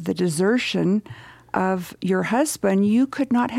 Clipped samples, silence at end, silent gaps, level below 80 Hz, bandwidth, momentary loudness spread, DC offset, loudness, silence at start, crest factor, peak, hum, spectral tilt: under 0.1%; 0 s; none; -60 dBFS; 15.5 kHz; 6 LU; under 0.1%; -22 LUFS; 0 s; 14 dB; -6 dBFS; none; -5.5 dB/octave